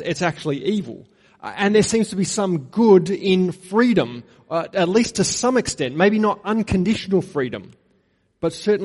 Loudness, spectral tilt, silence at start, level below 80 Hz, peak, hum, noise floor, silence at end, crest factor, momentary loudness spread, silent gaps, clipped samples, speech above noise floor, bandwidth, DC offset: -20 LUFS; -5 dB/octave; 0 s; -50 dBFS; -4 dBFS; none; -63 dBFS; 0 s; 16 dB; 10 LU; none; under 0.1%; 44 dB; 11.5 kHz; under 0.1%